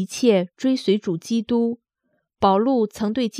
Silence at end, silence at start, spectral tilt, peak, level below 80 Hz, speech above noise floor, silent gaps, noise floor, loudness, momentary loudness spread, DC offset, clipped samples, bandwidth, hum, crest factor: 0 s; 0 s; -6 dB/octave; -4 dBFS; -58 dBFS; 52 dB; none; -72 dBFS; -21 LUFS; 6 LU; under 0.1%; under 0.1%; 14.5 kHz; none; 16 dB